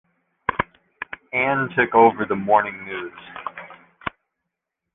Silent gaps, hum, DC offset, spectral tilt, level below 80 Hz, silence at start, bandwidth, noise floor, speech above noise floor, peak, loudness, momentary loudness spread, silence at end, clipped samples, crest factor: none; none; under 0.1%; -9 dB/octave; -54 dBFS; 0.5 s; 3.9 kHz; -82 dBFS; 62 dB; -2 dBFS; -21 LUFS; 19 LU; 0.85 s; under 0.1%; 20 dB